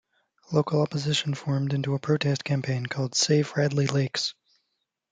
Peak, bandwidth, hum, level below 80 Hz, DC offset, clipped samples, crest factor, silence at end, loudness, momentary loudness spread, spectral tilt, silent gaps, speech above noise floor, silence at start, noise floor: -8 dBFS; 9.4 kHz; none; -66 dBFS; under 0.1%; under 0.1%; 18 dB; 0.8 s; -26 LUFS; 5 LU; -5 dB/octave; none; 54 dB; 0.5 s; -79 dBFS